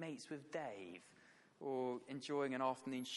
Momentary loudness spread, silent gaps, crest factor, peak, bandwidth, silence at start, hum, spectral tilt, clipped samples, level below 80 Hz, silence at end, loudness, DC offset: 14 LU; none; 20 dB; -26 dBFS; 11.5 kHz; 0 s; none; -4.5 dB/octave; under 0.1%; under -90 dBFS; 0 s; -45 LUFS; under 0.1%